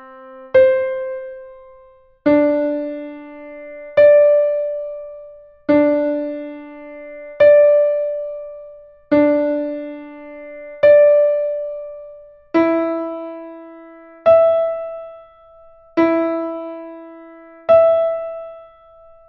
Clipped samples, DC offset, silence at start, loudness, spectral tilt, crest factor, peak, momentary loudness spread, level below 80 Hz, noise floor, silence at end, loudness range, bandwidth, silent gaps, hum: under 0.1%; under 0.1%; 0 s; -16 LUFS; -8.5 dB/octave; 16 dB; -2 dBFS; 24 LU; -56 dBFS; -48 dBFS; 0.65 s; 4 LU; 4.9 kHz; none; none